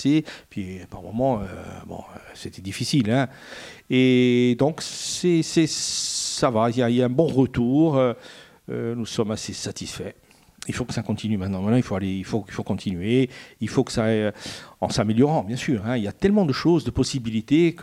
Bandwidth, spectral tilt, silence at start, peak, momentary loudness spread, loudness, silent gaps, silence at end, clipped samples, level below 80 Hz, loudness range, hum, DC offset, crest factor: 15 kHz; -5.5 dB/octave; 0 s; -4 dBFS; 16 LU; -23 LUFS; none; 0 s; under 0.1%; -50 dBFS; 6 LU; none; under 0.1%; 20 dB